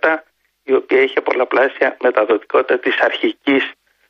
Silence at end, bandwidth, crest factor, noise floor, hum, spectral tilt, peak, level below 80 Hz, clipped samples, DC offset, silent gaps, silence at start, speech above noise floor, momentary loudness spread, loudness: 0.35 s; 6.2 kHz; 16 dB; -44 dBFS; none; -5 dB/octave; -2 dBFS; -68 dBFS; under 0.1%; under 0.1%; none; 0.05 s; 28 dB; 4 LU; -16 LUFS